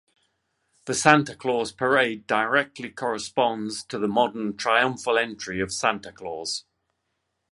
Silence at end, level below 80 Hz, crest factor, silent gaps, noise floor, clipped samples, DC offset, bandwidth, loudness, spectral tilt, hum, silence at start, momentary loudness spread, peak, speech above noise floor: 0.9 s; -62 dBFS; 26 dB; none; -77 dBFS; under 0.1%; under 0.1%; 11.5 kHz; -24 LUFS; -3.5 dB/octave; none; 0.85 s; 11 LU; 0 dBFS; 53 dB